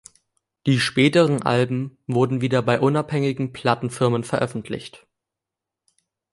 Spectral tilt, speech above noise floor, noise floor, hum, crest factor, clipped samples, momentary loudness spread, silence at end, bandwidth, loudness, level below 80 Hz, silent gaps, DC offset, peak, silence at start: -6 dB/octave; 66 dB; -86 dBFS; none; 20 dB; under 0.1%; 11 LU; 1.35 s; 11.5 kHz; -21 LUFS; -60 dBFS; none; under 0.1%; -2 dBFS; 0.65 s